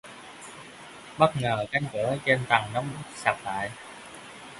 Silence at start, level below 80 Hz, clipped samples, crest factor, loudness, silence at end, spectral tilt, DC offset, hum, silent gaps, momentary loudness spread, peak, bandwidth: 0.05 s; -60 dBFS; under 0.1%; 26 dB; -27 LUFS; 0 s; -5 dB/octave; under 0.1%; none; none; 20 LU; -4 dBFS; 11.5 kHz